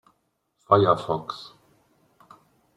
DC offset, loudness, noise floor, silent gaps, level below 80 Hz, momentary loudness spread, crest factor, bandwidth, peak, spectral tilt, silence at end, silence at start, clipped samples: under 0.1%; -22 LUFS; -73 dBFS; none; -64 dBFS; 21 LU; 24 dB; 11 kHz; -2 dBFS; -7.5 dB/octave; 1.35 s; 0.7 s; under 0.1%